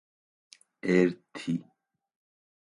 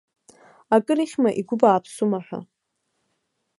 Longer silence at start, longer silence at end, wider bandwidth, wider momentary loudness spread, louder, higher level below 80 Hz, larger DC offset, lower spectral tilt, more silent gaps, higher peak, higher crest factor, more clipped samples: first, 0.85 s vs 0.7 s; second, 1 s vs 1.15 s; about the same, 11 kHz vs 11.5 kHz; about the same, 12 LU vs 11 LU; second, -29 LUFS vs -21 LUFS; about the same, -72 dBFS vs -70 dBFS; neither; about the same, -7 dB/octave vs -6.5 dB/octave; neither; second, -10 dBFS vs -2 dBFS; about the same, 22 dB vs 22 dB; neither